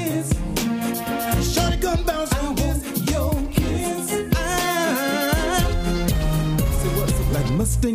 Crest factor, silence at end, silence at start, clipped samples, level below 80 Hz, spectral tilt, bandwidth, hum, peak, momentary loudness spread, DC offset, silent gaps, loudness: 16 dB; 0 s; 0 s; under 0.1%; -26 dBFS; -5 dB/octave; 16 kHz; none; -6 dBFS; 3 LU; under 0.1%; none; -22 LUFS